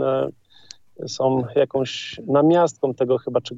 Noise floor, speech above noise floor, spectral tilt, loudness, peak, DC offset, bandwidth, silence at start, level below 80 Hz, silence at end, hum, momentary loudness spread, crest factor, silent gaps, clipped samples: -48 dBFS; 28 dB; -6 dB/octave; -21 LUFS; -6 dBFS; under 0.1%; 7.8 kHz; 0 s; -64 dBFS; 0 s; none; 12 LU; 16 dB; none; under 0.1%